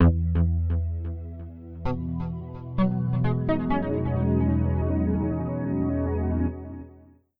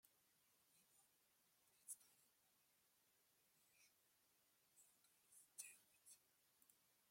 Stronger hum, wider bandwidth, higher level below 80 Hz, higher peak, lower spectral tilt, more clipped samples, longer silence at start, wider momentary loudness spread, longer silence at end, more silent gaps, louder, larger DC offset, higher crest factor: neither; second, 4.2 kHz vs 16.5 kHz; first, -34 dBFS vs under -90 dBFS; first, -8 dBFS vs -40 dBFS; first, -12 dB/octave vs 1 dB/octave; neither; about the same, 0 s vs 0.05 s; first, 13 LU vs 10 LU; first, 0.4 s vs 0 s; neither; first, -26 LUFS vs -62 LUFS; neither; second, 18 dB vs 32 dB